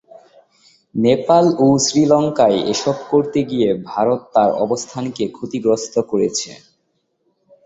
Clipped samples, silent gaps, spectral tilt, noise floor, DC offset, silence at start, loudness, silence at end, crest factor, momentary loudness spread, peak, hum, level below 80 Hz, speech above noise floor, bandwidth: under 0.1%; none; -5 dB/octave; -68 dBFS; under 0.1%; 0.95 s; -17 LUFS; 1.1 s; 16 dB; 10 LU; -2 dBFS; none; -56 dBFS; 52 dB; 8.2 kHz